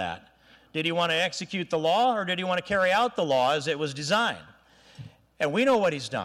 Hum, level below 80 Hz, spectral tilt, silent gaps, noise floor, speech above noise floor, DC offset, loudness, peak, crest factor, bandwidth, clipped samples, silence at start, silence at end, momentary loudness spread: none; -64 dBFS; -4 dB/octave; none; -49 dBFS; 23 dB; under 0.1%; -25 LUFS; -14 dBFS; 12 dB; 15.5 kHz; under 0.1%; 0 s; 0 s; 8 LU